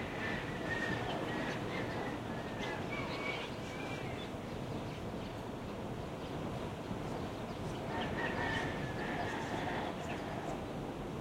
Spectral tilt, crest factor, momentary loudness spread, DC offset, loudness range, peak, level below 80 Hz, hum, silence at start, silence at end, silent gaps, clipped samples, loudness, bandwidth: -5.5 dB/octave; 16 dB; 6 LU; under 0.1%; 4 LU; -24 dBFS; -56 dBFS; none; 0 s; 0 s; none; under 0.1%; -40 LUFS; 16.5 kHz